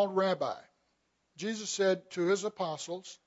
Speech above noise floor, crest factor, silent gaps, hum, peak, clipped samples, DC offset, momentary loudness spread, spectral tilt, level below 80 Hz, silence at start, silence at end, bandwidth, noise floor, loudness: 45 dB; 16 dB; none; none; -18 dBFS; under 0.1%; under 0.1%; 10 LU; -4 dB/octave; -84 dBFS; 0 s; 0.1 s; 8 kHz; -77 dBFS; -33 LUFS